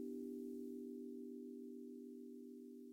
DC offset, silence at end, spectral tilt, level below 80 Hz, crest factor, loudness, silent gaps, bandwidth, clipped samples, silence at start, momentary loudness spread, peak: under 0.1%; 0 s; -7 dB/octave; under -90 dBFS; 12 dB; -52 LUFS; none; 16.5 kHz; under 0.1%; 0 s; 7 LU; -40 dBFS